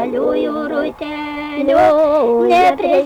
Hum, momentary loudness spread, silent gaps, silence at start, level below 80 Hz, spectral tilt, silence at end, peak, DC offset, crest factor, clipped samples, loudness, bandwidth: none; 12 LU; none; 0 s; -48 dBFS; -5.5 dB/octave; 0 s; -4 dBFS; under 0.1%; 10 dB; under 0.1%; -15 LUFS; 16 kHz